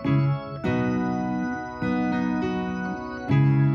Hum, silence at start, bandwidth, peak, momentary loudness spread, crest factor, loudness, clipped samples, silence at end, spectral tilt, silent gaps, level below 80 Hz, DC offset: none; 0 s; 6.2 kHz; -10 dBFS; 8 LU; 14 dB; -25 LUFS; under 0.1%; 0 s; -8.5 dB/octave; none; -50 dBFS; under 0.1%